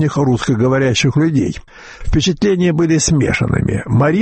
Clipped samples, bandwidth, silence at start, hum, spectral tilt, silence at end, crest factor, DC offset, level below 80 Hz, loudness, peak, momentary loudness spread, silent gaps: under 0.1%; 8.8 kHz; 0 s; none; -5.5 dB/octave; 0 s; 10 dB; under 0.1%; -30 dBFS; -15 LUFS; -4 dBFS; 5 LU; none